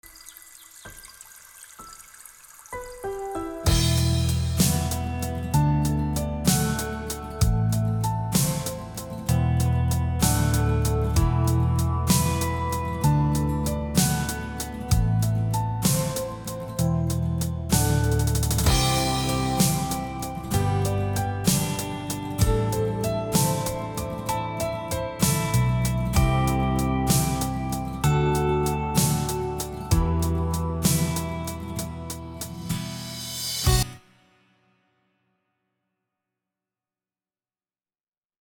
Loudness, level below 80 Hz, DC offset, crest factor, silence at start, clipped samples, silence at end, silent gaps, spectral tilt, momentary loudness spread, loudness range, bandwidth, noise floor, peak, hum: -25 LUFS; -34 dBFS; under 0.1%; 18 dB; 0.05 s; under 0.1%; 4.4 s; none; -5 dB/octave; 12 LU; 6 LU; 19 kHz; under -90 dBFS; -6 dBFS; none